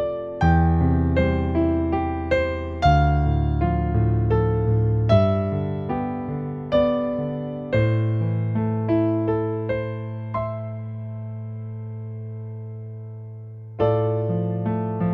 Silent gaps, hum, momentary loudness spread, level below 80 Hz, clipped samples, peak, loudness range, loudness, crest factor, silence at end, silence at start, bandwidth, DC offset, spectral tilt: none; none; 15 LU; -32 dBFS; under 0.1%; -4 dBFS; 10 LU; -23 LUFS; 18 dB; 0 s; 0 s; 6.2 kHz; under 0.1%; -9.5 dB/octave